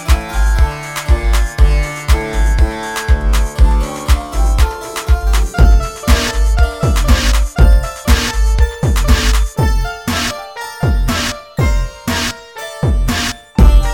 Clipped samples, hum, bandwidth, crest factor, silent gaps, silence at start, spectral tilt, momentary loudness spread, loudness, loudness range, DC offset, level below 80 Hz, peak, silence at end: under 0.1%; none; 16.5 kHz; 12 dB; none; 0 s; -4.5 dB/octave; 7 LU; -15 LUFS; 4 LU; under 0.1%; -14 dBFS; 0 dBFS; 0 s